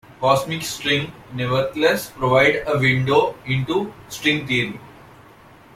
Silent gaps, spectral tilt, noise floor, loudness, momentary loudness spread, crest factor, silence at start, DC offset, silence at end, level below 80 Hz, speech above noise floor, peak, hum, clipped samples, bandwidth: none; -5 dB/octave; -47 dBFS; -20 LUFS; 10 LU; 18 dB; 0.1 s; under 0.1%; 0.85 s; -50 dBFS; 27 dB; -2 dBFS; none; under 0.1%; 16 kHz